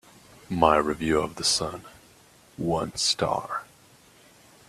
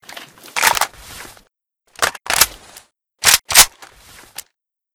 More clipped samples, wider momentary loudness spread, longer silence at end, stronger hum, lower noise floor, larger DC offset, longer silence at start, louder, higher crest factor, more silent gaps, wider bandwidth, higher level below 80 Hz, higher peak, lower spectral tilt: second, under 0.1% vs 0.2%; second, 13 LU vs 26 LU; second, 1.05 s vs 1.25 s; neither; second, -56 dBFS vs -68 dBFS; neither; first, 0.5 s vs 0.15 s; second, -25 LUFS vs -14 LUFS; about the same, 24 dB vs 20 dB; neither; second, 14.5 kHz vs over 20 kHz; second, -52 dBFS vs -44 dBFS; second, -4 dBFS vs 0 dBFS; first, -3.5 dB/octave vs 1.5 dB/octave